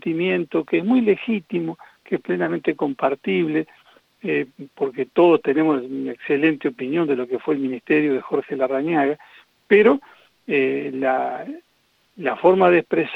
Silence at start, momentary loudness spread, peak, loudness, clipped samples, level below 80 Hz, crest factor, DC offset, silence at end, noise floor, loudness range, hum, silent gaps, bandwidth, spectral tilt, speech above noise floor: 0.05 s; 12 LU; -2 dBFS; -21 LUFS; under 0.1%; -68 dBFS; 18 dB; under 0.1%; 0 s; -63 dBFS; 4 LU; none; none; 5.2 kHz; -8.5 dB/octave; 43 dB